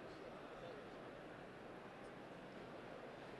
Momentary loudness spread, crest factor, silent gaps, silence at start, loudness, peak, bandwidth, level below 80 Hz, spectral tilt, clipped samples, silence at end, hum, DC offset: 2 LU; 14 dB; none; 0 s; -55 LUFS; -40 dBFS; 12 kHz; -76 dBFS; -5.5 dB/octave; under 0.1%; 0 s; none; under 0.1%